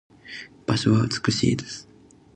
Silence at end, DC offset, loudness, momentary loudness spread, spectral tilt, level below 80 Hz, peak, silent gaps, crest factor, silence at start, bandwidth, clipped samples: 0.55 s; under 0.1%; -23 LUFS; 18 LU; -5.5 dB/octave; -52 dBFS; -6 dBFS; none; 18 dB; 0.25 s; 9.6 kHz; under 0.1%